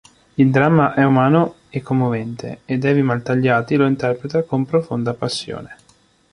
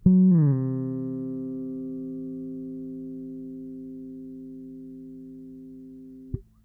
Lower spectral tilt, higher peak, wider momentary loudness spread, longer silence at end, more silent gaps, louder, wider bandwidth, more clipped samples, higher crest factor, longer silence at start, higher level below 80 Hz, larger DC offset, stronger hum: second, -7.5 dB/octave vs -14 dB/octave; first, -2 dBFS vs -8 dBFS; second, 13 LU vs 22 LU; first, 0.6 s vs 0.25 s; neither; first, -18 LUFS vs -28 LUFS; first, 11 kHz vs 2 kHz; neither; about the same, 16 dB vs 20 dB; first, 0.4 s vs 0 s; about the same, -54 dBFS vs -50 dBFS; neither; neither